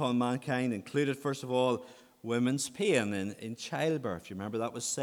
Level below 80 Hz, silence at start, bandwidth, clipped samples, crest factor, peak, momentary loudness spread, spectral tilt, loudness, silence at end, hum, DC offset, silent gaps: -74 dBFS; 0 s; 18.5 kHz; under 0.1%; 20 dB; -12 dBFS; 9 LU; -4.5 dB/octave; -32 LUFS; 0 s; none; under 0.1%; none